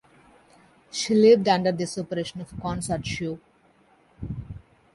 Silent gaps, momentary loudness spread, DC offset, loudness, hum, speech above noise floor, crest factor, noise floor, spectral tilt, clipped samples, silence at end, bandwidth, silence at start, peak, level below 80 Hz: none; 22 LU; under 0.1%; -24 LUFS; none; 37 dB; 20 dB; -60 dBFS; -5 dB/octave; under 0.1%; 0.35 s; 11.5 kHz; 0.95 s; -6 dBFS; -50 dBFS